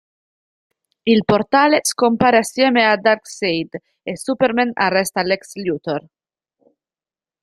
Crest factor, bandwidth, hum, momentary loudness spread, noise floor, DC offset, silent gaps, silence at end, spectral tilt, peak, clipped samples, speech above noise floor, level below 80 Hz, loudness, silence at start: 18 dB; 15 kHz; none; 12 LU; under -90 dBFS; under 0.1%; none; 1.4 s; -4 dB/octave; -2 dBFS; under 0.1%; over 73 dB; -56 dBFS; -17 LUFS; 1.05 s